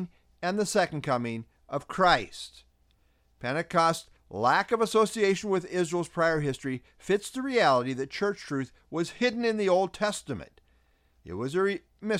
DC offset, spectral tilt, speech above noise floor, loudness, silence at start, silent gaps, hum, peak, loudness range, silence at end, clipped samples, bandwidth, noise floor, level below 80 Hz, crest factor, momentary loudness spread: under 0.1%; -4.5 dB/octave; 39 dB; -28 LUFS; 0 s; none; none; -8 dBFS; 3 LU; 0 s; under 0.1%; 15.5 kHz; -66 dBFS; -58 dBFS; 20 dB; 13 LU